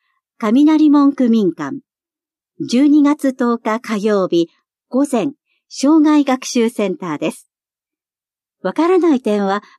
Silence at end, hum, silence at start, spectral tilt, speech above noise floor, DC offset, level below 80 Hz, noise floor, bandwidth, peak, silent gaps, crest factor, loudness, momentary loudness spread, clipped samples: 0.2 s; none; 0.4 s; -5.5 dB/octave; over 76 dB; under 0.1%; -74 dBFS; under -90 dBFS; 12.5 kHz; -4 dBFS; none; 12 dB; -15 LUFS; 13 LU; under 0.1%